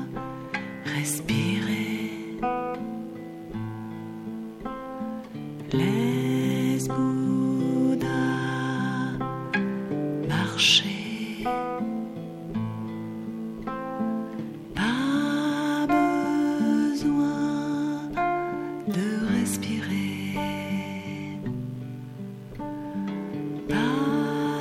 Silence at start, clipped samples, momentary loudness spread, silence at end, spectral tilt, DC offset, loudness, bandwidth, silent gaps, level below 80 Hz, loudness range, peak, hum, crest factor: 0 s; under 0.1%; 12 LU; 0 s; -5 dB/octave; under 0.1%; -27 LUFS; 16 kHz; none; -54 dBFS; 8 LU; -6 dBFS; none; 22 dB